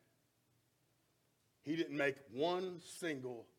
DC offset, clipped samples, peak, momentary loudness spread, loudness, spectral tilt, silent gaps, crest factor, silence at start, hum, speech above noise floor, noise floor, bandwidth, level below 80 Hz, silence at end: under 0.1%; under 0.1%; -22 dBFS; 8 LU; -41 LUFS; -5 dB/octave; none; 22 dB; 1.65 s; none; 38 dB; -78 dBFS; 16.5 kHz; -88 dBFS; 0.15 s